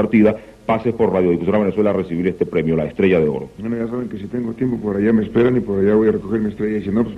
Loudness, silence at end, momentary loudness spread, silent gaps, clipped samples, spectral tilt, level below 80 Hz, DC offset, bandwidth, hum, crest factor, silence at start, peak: -18 LUFS; 0 s; 9 LU; none; under 0.1%; -9.5 dB/octave; -44 dBFS; under 0.1%; 5.6 kHz; none; 14 dB; 0 s; -2 dBFS